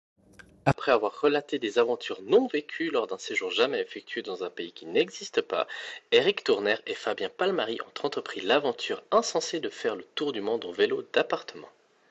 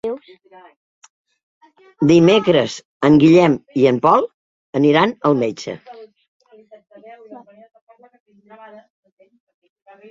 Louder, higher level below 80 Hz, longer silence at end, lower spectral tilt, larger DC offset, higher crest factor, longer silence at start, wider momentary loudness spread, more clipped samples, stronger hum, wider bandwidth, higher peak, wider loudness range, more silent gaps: second, -28 LUFS vs -15 LUFS; second, -64 dBFS vs -58 dBFS; second, 0.4 s vs 2.75 s; second, -4 dB/octave vs -6.5 dB/octave; neither; first, 24 dB vs 18 dB; first, 0.65 s vs 0.05 s; second, 9 LU vs 18 LU; neither; neither; about the same, 8.2 kHz vs 7.8 kHz; second, -6 dBFS vs 0 dBFS; second, 2 LU vs 9 LU; second, none vs 0.76-1.02 s, 1.10-1.25 s, 1.43-1.61 s, 2.85-3.00 s, 4.34-4.73 s, 6.28-6.40 s